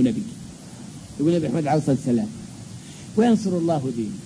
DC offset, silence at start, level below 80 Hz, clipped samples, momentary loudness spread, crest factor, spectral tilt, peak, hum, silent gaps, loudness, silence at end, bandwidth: under 0.1%; 0 s; -54 dBFS; under 0.1%; 19 LU; 16 dB; -7 dB/octave; -8 dBFS; none; none; -22 LUFS; 0 s; 11 kHz